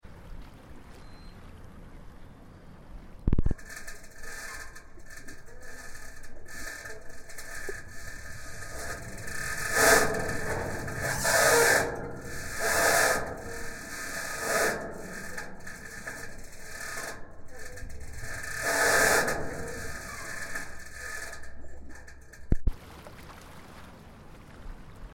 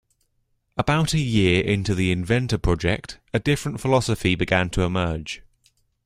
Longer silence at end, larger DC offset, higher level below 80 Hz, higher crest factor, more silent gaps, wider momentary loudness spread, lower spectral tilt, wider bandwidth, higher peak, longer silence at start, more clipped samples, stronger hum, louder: second, 0 s vs 0.65 s; neither; about the same, -40 dBFS vs -38 dBFS; first, 24 dB vs 18 dB; neither; first, 27 LU vs 9 LU; second, -2.5 dB/octave vs -5.5 dB/octave; first, 17 kHz vs 15 kHz; second, -8 dBFS vs -4 dBFS; second, 0.05 s vs 0.75 s; neither; neither; second, -29 LUFS vs -22 LUFS